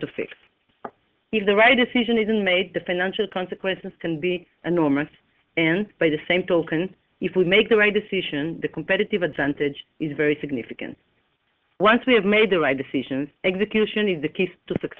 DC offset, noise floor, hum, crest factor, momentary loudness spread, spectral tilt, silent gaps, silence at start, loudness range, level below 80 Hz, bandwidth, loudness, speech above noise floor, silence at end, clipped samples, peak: under 0.1%; -69 dBFS; none; 18 dB; 14 LU; -8 dB/octave; none; 0 s; 4 LU; -58 dBFS; 4.4 kHz; -22 LUFS; 47 dB; 0.1 s; under 0.1%; -4 dBFS